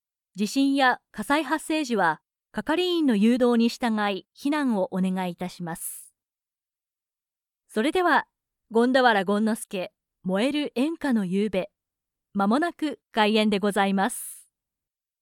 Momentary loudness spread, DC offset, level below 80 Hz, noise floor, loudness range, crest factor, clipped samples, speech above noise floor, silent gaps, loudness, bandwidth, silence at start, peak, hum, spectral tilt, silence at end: 13 LU; under 0.1%; -64 dBFS; under -90 dBFS; 5 LU; 20 dB; under 0.1%; over 66 dB; none; -25 LUFS; 18 kHz; 0.35 s; -6 dBFS; none; -5 dB/octave; 0.8 s